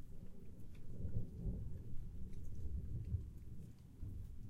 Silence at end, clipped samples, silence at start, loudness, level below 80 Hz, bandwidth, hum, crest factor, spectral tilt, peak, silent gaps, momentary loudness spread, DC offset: 0 s; under 0.1%; 0 s; -50 LUFS; -50 dBFS; 2.7 kHz; none; 16 dB; -9 dB/octave; -28 dBFS; none; 12 LU; under 0.1%